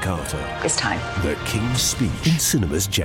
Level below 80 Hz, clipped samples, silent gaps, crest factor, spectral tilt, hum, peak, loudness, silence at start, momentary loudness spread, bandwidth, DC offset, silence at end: -36 dBFS; under 0.1%; none; 14 dB; -3.5 dB/octave; none; -8 dBFS; -21 LUFS; 0 s; 6 LU; 17 kHz; under 0.1%; 0 s